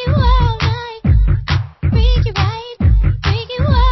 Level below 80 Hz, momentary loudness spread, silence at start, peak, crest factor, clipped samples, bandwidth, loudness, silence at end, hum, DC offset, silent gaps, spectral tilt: -16 dBFS; 5 LU; 0 s; -2 dBFS; 12 dB; under 0.1%; 6 kHz; -16 LUFS; 0 s; none; under 0.1%; none; -7 dB/octave